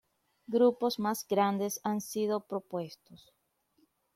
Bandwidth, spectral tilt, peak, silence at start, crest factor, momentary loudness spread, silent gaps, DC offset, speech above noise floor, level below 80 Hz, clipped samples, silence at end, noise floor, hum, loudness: 16 kHz; -5 dB/octave; -16 dBFS; 0.5 s; 18 dB; 11 LU; none; under 0.1%; 41 dB; -78 dBFS; under 0.1%; 1 s; -72 dBFS; none; -31 LUFS